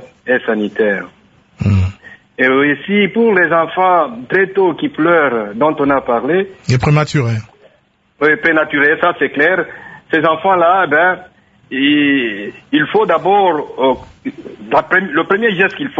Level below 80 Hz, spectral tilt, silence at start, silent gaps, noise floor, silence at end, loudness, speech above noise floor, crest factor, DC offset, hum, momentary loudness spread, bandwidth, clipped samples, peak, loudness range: -38 dBFS; -6.5 dB/octave; 0 s; none; -55 dBFS; 0 s; -13 LUFS; 42 dB; 14 dB; under 0.1%; none; 10 LU; 8 kHz; under 0.1%; 0 dBFS; 2 LU